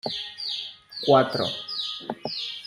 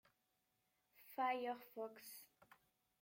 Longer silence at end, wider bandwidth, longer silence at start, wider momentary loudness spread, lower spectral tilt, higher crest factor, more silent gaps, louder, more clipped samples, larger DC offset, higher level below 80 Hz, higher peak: second, 0 s vs 0.75 s; about the same, 15 kHz vs 16.5 kHz; second, 0.05 s vs 1 s; second, 12 LU vs 21 LU; first, -5 dB/octave vs -2.5 dB/octave; about the same, 20 dB vs 20 dB; neither; first, -26 LUFS vs -46 LUFS; neither; neither; first, -68 dBFS vs under -90 dBFS; first, -6 dBFS vs -30 dBFS